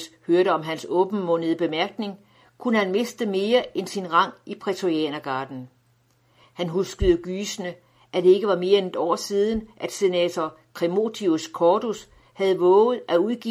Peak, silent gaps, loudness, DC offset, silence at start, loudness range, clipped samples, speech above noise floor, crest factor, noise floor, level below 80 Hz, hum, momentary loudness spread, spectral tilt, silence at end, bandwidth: -4 dBFS; none; -23 LUFS; under 0.1%; 0 s; 5 LU; under 0.1%; 40 dB; 18 dB; -63 dBFS; -46 dBFS; none; 12 LU; -5 dB/octave; 0 s; 15 kHz